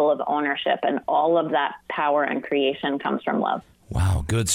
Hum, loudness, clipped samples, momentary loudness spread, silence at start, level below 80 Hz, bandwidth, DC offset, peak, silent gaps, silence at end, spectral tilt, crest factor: none; -23 LUFS; under 0.1%; 5 LU; 0 s; -40 dBFS; 15.5 kHz; under 0.1%; -10 dBFS; none; 0 s; -5 dB/octave; 12 dB